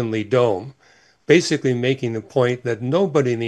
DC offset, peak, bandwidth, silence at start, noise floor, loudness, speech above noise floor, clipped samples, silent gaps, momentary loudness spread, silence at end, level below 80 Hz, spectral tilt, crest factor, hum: under 0.1%; 0 dBFS; 11.5 kHz; 0 s; -55 dBFS; -20 LUFS; 36 dB; under 0.1%; none; 8 LU; 0 s; -64 dBFS; -6 dB/octave; 18 dB; none